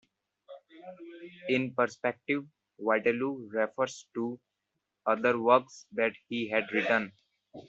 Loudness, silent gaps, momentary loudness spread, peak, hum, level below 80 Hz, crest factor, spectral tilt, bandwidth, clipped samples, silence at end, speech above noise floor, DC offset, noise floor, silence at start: -30 LUFS; none; 20 LU; -10 dBFS; none; -78 dBFS; 22 dB; -3 dB/octave; 8 kHz; under 0.1%; 0.1 s; 54 dB; under 0.1%; -84 dBFS; 0.5 s